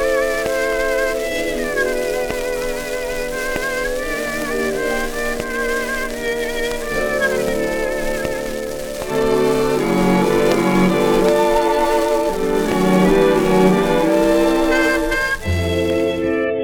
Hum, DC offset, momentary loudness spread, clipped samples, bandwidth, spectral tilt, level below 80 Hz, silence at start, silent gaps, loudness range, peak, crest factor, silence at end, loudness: none; under 0.1%; 8 LU; under 0.1%; 19 kHz; -5 dB/octave; -32 dBFS; 0 s; none; 6 LU; -2 dBFS; 16 dB; 0 s; -18 LUFS